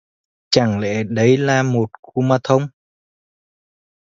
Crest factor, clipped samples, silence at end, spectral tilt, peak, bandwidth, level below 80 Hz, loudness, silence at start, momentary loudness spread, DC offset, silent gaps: 18 dB; under 0.1%; 1.35 s; -6 dB/octave; 0 dBFS; 7.8 kHz; -54 dBFS; -17 LUFS; 0.5 s; 7 LU; under 0.1%; 1.99-2.03 s